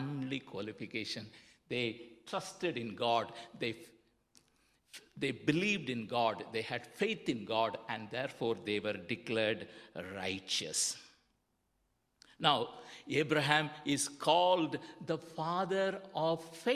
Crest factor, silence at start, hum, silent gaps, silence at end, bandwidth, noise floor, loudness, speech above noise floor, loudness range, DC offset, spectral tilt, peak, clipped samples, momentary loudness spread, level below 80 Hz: 26 dB; 0 s; none; none; 0 s; 15 kHz; -79 dBFS; -35 LUFS; 43 dB; 6 LU; under 0.1%; -3.5 dB/octave; -10 dBFS; under 0.1%; 12 LU; -74 dBFS